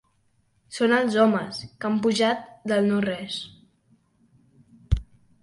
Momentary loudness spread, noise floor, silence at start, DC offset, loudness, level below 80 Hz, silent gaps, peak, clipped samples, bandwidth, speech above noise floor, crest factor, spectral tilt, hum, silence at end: 13 LU; -66 dBFS; 0.7 s; under 0.1%; -24 LUFS; -40 dBFS; none; -8 dBFS; under 0.1%; 11.5 kHz; 43 dB; 18 dB; -5.5 dB/octave; none; 0.4 s